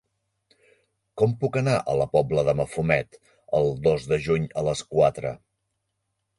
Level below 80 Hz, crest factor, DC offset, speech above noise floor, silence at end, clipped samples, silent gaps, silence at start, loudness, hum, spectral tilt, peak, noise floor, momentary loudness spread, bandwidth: -50 dBFS; 20 dB; under 0.1%; 55 dB; 1 s; under 0.1%; none; 1.15 s; -24 LUFS; none; -6.5 dB/octave; -6 dBFS; -78 dBFS; 9 LU; 11.5 kHz